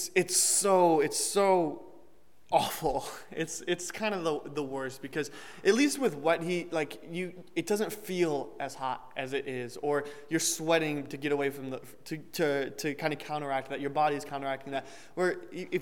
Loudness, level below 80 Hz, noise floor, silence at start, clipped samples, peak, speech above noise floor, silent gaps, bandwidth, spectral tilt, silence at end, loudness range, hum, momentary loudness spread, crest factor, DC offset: -30 LUFS; -64 dBFS; -63 dBFS; 0 s; under 0.1%; -10 dBFS; 32 dB; none; 19 kHz; -3.5 dB/octave; 0 s; 5 LU; none; 13 LU; 22 dB; 0.3%